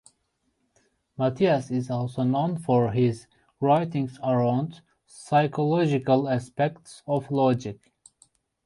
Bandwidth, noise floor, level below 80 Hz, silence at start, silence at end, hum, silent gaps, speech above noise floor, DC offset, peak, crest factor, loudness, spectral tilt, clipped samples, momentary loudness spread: 11.5 kHz; -74 dBFS; -62 dBFS; 1.2 s; 0.9 s; none; none; 49 dB; under 0.1%; -8 dBFS; 18 dB; -25 LUFS; -7.5 dB/octave; under 0.1%; 7 LU